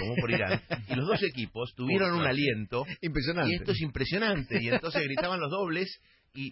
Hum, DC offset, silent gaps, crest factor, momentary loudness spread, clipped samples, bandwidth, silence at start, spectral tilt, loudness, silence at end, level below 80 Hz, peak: none; under 0.1%; none; 16 dB; 8 LU; under 0.1%; 5.8 kHz; 0 s; -10 dB/octave; -30 LUFS; 0 s; -50 dBFS; -14 dBFS